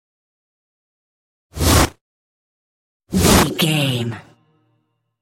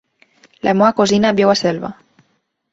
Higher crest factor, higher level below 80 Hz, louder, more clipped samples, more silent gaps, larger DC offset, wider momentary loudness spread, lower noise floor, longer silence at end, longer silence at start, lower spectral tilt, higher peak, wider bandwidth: about the same, 20 dB vs 16 dB; first, -34 dBFS vs -54 dBFS; about the same, -17 LUFS vs -15 LUFS; neither; first, 2.01-3.00 s vs none; neither; first, 14 LU vs 11 LU; about the same, -68 dBFS vs -65 dBFS; first, 1 s vs 0.8 s; first, 1.55 s vs 0.65 s; about the same, -4 dB/octave vs -5 dB/octave; about the same, 0 dBFS vs -2 dBFS; first, 16.5 kHz vs 8 kHz